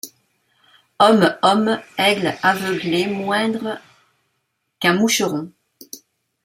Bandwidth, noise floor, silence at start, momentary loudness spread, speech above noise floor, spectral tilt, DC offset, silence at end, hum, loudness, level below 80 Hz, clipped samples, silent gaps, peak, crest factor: 16 kHz; -72 dBFS; 0.05 s; 22 LU; 55 dB; -4 dB/octave; under 0.1%; 0.5 s; none; -18 LUFS; -64 dBFS; under 0.1%; none; -2 dBFS; 18 dB